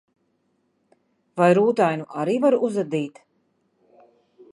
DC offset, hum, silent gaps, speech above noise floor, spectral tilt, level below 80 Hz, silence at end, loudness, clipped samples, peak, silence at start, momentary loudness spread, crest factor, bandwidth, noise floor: under 0.1%; none; none; 49 dB; -7 dB/octave; -76 dBFS; 1.45 s; -21 LUFS; under 0.1%; -4 dBFS; 1.35 s; 11 LU; 20 dB; 11.5 kHz; -69 dBFS